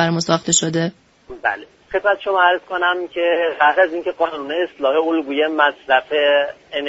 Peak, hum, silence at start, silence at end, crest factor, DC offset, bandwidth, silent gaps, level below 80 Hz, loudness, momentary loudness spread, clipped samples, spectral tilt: 0 dBFS; none; 0 s; 0 s; 18 dB; under 0.1%; 8 kHz; none; -58 dBFS; -18 LUFS; 7 LU; under 0.1%; -2.5 dB/octave